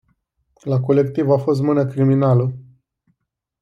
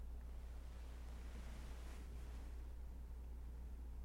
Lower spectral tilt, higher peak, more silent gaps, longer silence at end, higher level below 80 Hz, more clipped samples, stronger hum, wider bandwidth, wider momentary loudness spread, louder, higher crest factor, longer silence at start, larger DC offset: first, -10 dB/octave vs -6 dB/octave; first, -4 dBFS vs -40 dBFS; neither; first, 1 s vs 0 s; second, -60 dBFS vs -50 dBFS; neither; neither; second, 7 kHz vs 16 kHz; first, 9 LU vs 1 LU; first, -18 LUFS vs -55 LUFS; about the same, 14 dB vs 10 dB; first, 0.65 s vs 0 s; neither